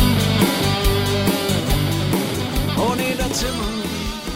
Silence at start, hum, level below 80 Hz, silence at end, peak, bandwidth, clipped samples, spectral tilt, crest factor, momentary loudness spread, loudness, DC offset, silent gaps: 0 s; none; -28 dBFS; 0 s; -4 dBFS; 16.5 kHz; under 0.1%; -4.5 dB/octave; 14 dB; 7 LU; -20 LUFS; under 0.1%; none